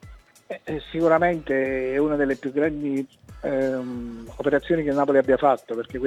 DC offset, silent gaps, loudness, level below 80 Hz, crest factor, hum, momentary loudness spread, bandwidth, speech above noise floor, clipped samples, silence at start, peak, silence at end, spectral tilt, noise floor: under 0.1%; none; -23 LUFS; -48 dBFS; 18 dB; none; 14 LU; 12 kHz; 24 dB; under 0.1%; 0.05 s; -6 dBFS; 0 s; -7.5 dB/octave; -47 dBFS